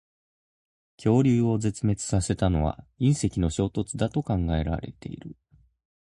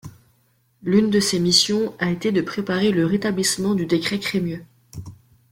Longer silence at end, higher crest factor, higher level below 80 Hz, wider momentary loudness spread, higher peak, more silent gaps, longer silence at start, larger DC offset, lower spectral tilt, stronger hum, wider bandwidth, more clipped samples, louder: first, 0.8 s vs 0.35 s; about the same, 18 dB vs 20 dB; first, -40 dBFS vs -56 dBFS; second, 14 LU vs 18 LU; second, -10 dBFS vs -2 dBFS; neither; first, 1 s vs 0.05 s; neither; first, -6.5 dB/octave vs -4 dB/octave; neither; second, 11.5 kHz vs 16.5 kHz; neither; second, -26 LUFS vs -20 LUFS